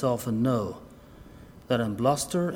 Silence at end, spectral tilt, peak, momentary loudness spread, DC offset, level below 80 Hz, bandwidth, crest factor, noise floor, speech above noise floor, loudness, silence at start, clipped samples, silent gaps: 0 s; -6 dB/octave; -10 dBFS; 8 LU; under 0.1%; -54 dBFS; 20 kHz; 18 dB; -48 dBFS; 22 dB; -27 LUFS; 0 s; under 0.1%; none